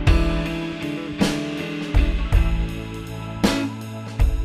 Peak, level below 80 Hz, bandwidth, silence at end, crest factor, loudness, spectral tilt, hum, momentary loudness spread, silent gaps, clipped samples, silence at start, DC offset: -4 dBFS; -24 dBFS; 14 kHz; 0 s; 18 dB; -24 LUFS; -6 dB/octave; none; 10 LU; none; under 0.1%; 0 s; under 0.1%